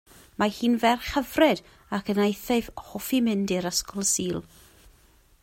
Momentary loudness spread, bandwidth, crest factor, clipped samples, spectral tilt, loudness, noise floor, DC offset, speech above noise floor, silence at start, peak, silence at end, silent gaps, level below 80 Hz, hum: 11 LU; 16 kHz; 18 dB; under 0.1%; -3.5 dB/octave; -25 LUFS; -58 dBFS; under 0.1%; 33 dB; 0.4 s; -8 dBFS; 1 s; none; -52 dBFS; none